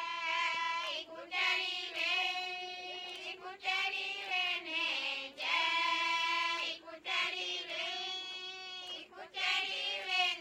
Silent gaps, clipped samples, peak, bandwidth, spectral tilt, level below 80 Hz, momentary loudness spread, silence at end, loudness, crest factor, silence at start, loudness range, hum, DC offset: none; under 0.1%; -20 dBFS; 16.5 kHz; 0.5 dB/octave; -82 dBFS; 11 LU; 0 s; -34 LUFS; 18 dB; 0 s; 3 LU; none; under 0.1%